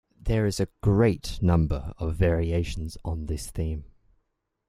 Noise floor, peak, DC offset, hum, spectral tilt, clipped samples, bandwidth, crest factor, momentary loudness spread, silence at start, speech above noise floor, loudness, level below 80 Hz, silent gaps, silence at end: -75 dBFS; -8 dBFS; under 0.1%; none; -7 dB/octave; under 0.1%; 14 kHz; 20 dB; 11 LU; 0.25 s; 50 dB; -27 LUFS; -36 dBFS; none; 0.85 s